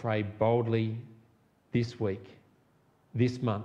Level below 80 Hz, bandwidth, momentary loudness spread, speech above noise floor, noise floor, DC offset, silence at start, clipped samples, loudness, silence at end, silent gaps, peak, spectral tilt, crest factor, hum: -66 dBFS; 7.8 kHz; 12 LU; 37 dB; -66 dBFS; under 0.1%; 0 s; under 0.1%; -31 LUFS; 0 s; none; -14 dBFS; -8 dB/octave; 18 dB; none